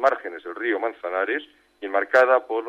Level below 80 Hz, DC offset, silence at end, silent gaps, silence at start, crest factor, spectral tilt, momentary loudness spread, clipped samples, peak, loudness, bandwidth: -74 dBFS; under 0.1%; 0 s; none; 0 s; 18 dB; -3.5 dB/octave; 13 LU; under 0.1%; -6 dBFS; -23 LUFS; 8.4 kHz